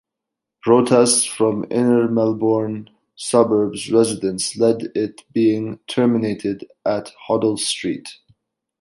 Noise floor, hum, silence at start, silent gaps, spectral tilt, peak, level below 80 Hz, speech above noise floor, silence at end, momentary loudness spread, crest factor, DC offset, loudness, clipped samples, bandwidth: -83 dBFS; none; 0.65 s; none; -4.5 dB/octave; -2 dBFS; -60 dBFS; 65 dB; 0.65 s; 11 LU; 18 dB; under 0.1%; -19 LUFS; under 0.1%; 11.5 kHz